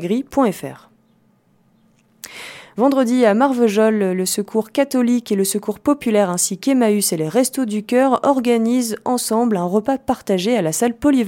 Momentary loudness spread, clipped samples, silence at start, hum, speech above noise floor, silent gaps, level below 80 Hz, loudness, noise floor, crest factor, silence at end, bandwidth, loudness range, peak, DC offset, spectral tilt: 6 LU; under 0.1%; 0 s; none; 41 dB; none; -56 dBFS; -17 LUFS; -58 dBFS; 16 dB; 0 s; 17 kHz; 3 LU; -2 dBFS; under 0.1%; -4.5 dB/octave